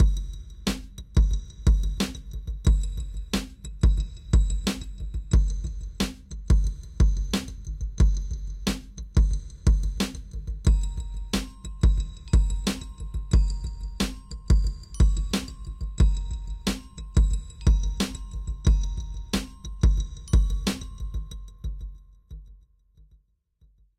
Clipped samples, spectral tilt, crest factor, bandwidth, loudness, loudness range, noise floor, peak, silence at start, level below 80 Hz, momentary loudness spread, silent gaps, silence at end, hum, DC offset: under 0.1%; -5.5 dB/octave; 14 dB; 13.5 kHz; -28 LUFS; 2 LU; -62 dBFS; -10 dBFS; 0 s; -26 dBFS; 12 LU; none; 1.4 s; none; under 0.1%